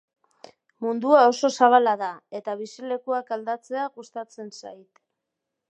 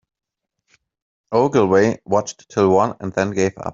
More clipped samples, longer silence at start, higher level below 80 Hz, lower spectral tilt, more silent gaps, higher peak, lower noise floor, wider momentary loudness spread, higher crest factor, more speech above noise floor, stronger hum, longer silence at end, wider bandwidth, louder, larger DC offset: neither; second, 0.8 s vs 1.3 s; second, -86 dBFS vs -58 dBFS; second, -3.5 dB/octave vs -6 dB/octave; neither; about the same, -4 dBFS vs -2 dBFS; first, -83 dBFS vs -72 dBFS; first, 21 LU vs 7 LU; first, 22 dB vs 16 dB; first, 60 dB vs 55 dB; neither; first, 0.95 s vs 0 s; first, 8.4 kHz vs 7.6 kHz; second, -23 LUFS vs -18 LUFS; neither